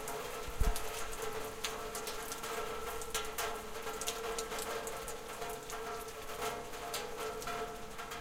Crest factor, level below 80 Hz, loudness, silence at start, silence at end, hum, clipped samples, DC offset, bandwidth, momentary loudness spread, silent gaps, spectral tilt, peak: 22 dB; -48 dBFS; -40 LUFS; 0 s; 0 s; none; under 0.1%; under 0.1%; 16.5 kHz; 5 LU; none; -2.5 dB/octave; -18 dBFS